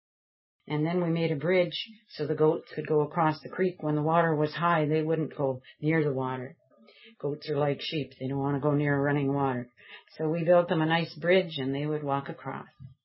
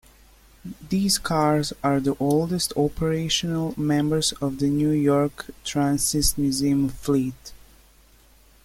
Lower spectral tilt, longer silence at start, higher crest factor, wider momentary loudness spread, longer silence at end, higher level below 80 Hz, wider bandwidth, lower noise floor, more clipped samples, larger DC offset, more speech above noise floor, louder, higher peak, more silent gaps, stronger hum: first, -11 dB/octave vs -4.5 dB/octave; about the same, 0.65 s vs 0.65 s; about the same, 20 dB vs 18 dB; first, 11 LU vs 7 LU; second, 0.15 s vs 1.1 s; second, -70 dBFS vs -44 dBFS; second, 5.8 kHz vs 16.5 kHz; about the same, -56 dBFS vs -54 dBFS; neither; neither; about the same, 28 dB vs 31 dB; second, -28 LUFS vs -23 LUFS; about the same, -8 dBFS vs -6 dBFS; neither; neither